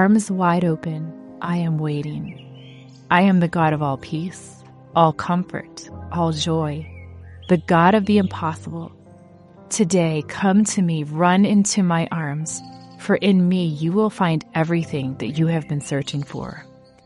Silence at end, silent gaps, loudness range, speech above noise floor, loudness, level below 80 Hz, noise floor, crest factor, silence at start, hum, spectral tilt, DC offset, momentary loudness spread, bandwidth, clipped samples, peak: 0.45 s; none; 4 LU; 26 dB; -20 LUFS; -54 dBFS; -46 dBFS; 18 dB; 0 s; none; -6 dB/octave; under 0.1%; 17 LU; 11.5 kHz; under 0.1%; -2 dBFS